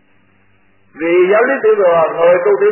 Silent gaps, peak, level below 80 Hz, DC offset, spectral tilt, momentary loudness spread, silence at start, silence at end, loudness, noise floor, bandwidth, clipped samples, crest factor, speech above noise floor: none; 0 dBFS; -62 dBFS; under 0.1%; -10 dB/octave; 3 LU; 0.95 s; 0 s; -12 LUFS; -55 dBFS; 3.1 kHz; under 0.1%; 12 dB; 44 dB